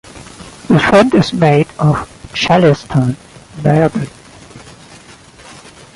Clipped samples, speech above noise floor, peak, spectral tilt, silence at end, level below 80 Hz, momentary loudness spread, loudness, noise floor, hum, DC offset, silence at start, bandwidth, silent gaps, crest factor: under 0.1%; 28 dB; 0 dBFS; -6.5 dB/octave; 0.45 s; -42 dBFS; 24 LU; -12 LUFS; -39 dBFS; none; under 0.1%; 0.15 s; 11.5 kHz; none; 14 dB